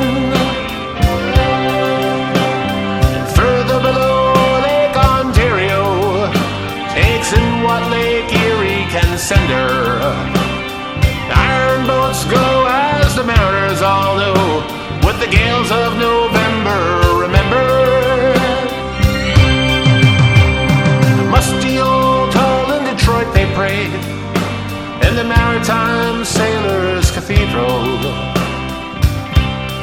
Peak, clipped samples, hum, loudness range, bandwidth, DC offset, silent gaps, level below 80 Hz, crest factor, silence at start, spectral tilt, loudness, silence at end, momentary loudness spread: 0 dBFS; 0.1%; none; 3 LU; 19 kHz; under 0.1%; none; -22 dBFS; 14 dB; 0 s; -5.5 dB/octave; -13 LUFS; 0 s; 6 LU